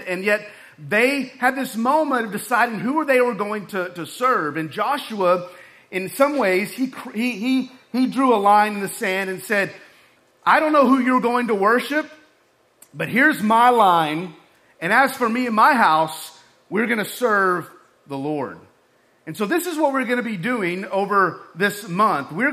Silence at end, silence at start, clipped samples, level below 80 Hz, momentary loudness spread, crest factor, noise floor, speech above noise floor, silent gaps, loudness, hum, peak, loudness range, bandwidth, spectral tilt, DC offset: 0 s; 0 s; under 0.1%; -72 dBFS; 12 LU; 18 dB; -60 dBFS; 40 dB; none; -20 LUFS; none; -4 dBFS; 5 LU; 15.5 kHz; -4.5 dB/octave; under 0.1%